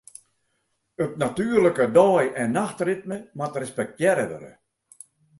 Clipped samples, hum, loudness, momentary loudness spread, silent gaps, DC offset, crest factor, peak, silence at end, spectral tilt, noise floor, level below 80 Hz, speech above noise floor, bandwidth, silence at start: under 0.1%; none; -23 LUFS; 13 LU; none; under 0.1%; 20 dB; -4 dBFS; 0.9 s; -6 dB/octave; -73 dBFS; -62 dBFS; 51 dB; 11.5 kHz; 1 s